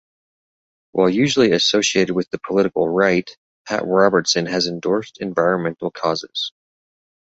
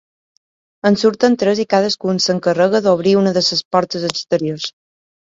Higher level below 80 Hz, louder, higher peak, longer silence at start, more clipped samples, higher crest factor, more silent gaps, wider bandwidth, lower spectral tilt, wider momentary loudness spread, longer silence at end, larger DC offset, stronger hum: about the same, -58 dBFS vs -60 dBFS; second, -19 LUFS vs -16 LUFS; about the same, -2 dBFS vs 0 dBFS; about the same, 0.95 s vs 0.85 s; neither; about the same, 18 dB vs 16 dB; first, 3.37-3.65 s vs 3.65-3.71 s; about the same, 8 kHz vs 7.8 kHz; about the same, -4 dB/octave vs -5 dB/octave; first, 10 LU vs 7 LU; first, 0.9 s vs 0.6 s; neither; neither